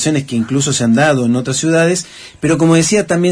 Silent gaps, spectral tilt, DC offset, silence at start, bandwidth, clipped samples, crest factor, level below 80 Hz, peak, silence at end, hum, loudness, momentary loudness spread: none; -4.5 dB/octave; under 0.1%; 0 s; 11 kHz; under 0.1%; 12 dB; -48 dBFS; 0 dBFS; 0 s; none; -13 LUFS; 6 LU